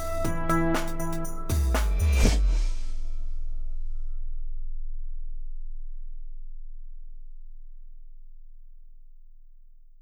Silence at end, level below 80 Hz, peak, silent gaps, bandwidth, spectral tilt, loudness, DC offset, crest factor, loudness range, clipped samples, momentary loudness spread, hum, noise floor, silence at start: 0 s; -28 dBFS; -6 dBFS; none; 18.5 kHz; -5.5 dB/octave; -30 LUFS; under 0.1%; 22 dB; 23 LU; under 0.1%; 24 LU; none; -48 dBFS; 0 s